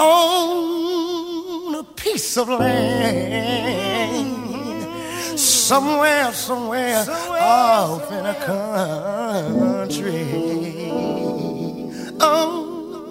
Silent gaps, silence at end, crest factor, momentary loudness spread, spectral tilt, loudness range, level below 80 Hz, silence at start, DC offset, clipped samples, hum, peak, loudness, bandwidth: none; 0 s; 18 dB; 12 LU; -3.5 dB/octave; 5 LU; -54 dBFS; 0 s; under 0.1%; under 0.1%; none; -2 dBFS; -20 LUFS; 16.5 kHz